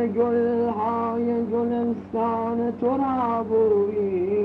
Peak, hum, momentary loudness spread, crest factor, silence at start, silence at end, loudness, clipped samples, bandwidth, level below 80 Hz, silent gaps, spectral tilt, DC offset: -12 dBFS; none; 4 LU; 12 dB; 0 s; 0 s; -23 LUFS; under 0.1%; 4.8 kHz; -58 dBFS; none; -10 dB/octave; under 0.1%